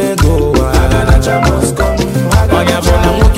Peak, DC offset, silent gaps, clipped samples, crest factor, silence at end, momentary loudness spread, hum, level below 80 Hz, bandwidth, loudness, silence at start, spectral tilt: 0 dBFS; under 0.1%; none; under 0.1%; 10 dB; 0 s; 3 LU; none; -14 dBFS; 16.5 kHz; -11 LUFS; 0 s; -5.5 dB/octave